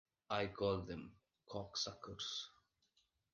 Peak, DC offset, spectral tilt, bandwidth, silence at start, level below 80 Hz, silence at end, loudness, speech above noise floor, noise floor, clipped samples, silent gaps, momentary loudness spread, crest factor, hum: -26 dBFS; under 0.1%; -4 dB/octave; 10 kHz; 0.3 s; -66 dBFS; 0.8 s; -44 LUFS; 37 dB; -81 dBFS; under 0.1%; none; 12 LU; 20 dB; none